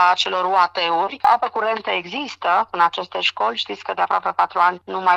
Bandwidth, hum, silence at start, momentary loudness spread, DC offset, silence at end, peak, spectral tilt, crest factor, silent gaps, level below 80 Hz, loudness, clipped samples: 9.4 kHz; none; 0 s; 6 LU; under 0.1%; 0 s; -2 dBFS; -2.5 dB/octave; 18 dB; none; -68 dBFS; -19 LUFS; under 0.1%